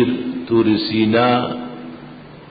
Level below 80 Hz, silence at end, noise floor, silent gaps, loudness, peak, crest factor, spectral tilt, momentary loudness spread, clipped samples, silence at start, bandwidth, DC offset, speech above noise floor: -52 dBFS; 0.05 s; -38 dBFS; none; -17 LUFS; -4 dBFS; 14 dB; -11.5 dB/octave; 20 LU; under 0.1%; 0 s; 5 kHz; under 0.1%; 22 dB